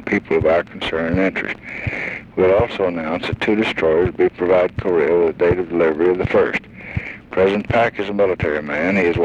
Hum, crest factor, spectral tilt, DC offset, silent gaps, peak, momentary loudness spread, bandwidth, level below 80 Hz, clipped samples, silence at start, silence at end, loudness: none; 12 dB; -7.5 dB/octave; under 0.1%; none; -4 dBFS; 9 LU; 8.4 kHz; -40 dBFS; under 0.1%; 0 s; 0 s; -18 LUFS